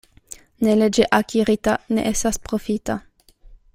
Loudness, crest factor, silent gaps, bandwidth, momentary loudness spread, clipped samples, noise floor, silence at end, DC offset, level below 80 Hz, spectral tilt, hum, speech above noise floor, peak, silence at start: -20 LUFS; 18 dB; none; 16 kHz; 14 LU; under 0.1%; -48 dBFS; 0.2 s; under 0.1%; -42 dBFS; -4.5 dB/octave; none; 28 dB; -2 dBFS; 0.6 s